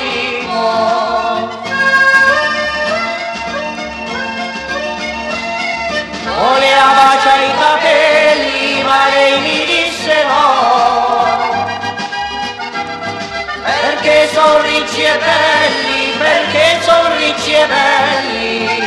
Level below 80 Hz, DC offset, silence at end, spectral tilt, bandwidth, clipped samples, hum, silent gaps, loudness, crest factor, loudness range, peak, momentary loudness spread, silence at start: -46 dBFS; under 0.1%; 0 s; -2.5 dB/octave; 12.5 kHz; under 0.1%; none; none; -12 LUFS; 12 dB; 6 LU; 0 dBFS; 11 LU; 0 s